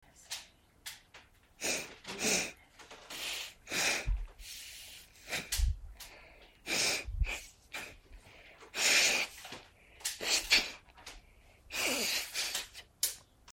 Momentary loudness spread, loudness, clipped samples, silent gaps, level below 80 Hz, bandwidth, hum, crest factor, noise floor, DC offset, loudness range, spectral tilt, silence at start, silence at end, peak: 22 LU; -33 LUFS; under 0.1%; none; -46 dBFS; 16.5 kHz; none; 26 dB; -61 dBFS; under 0.1%; 6 LU; -1 dB/octave; 0.2 s; 0 s; -10 dBFS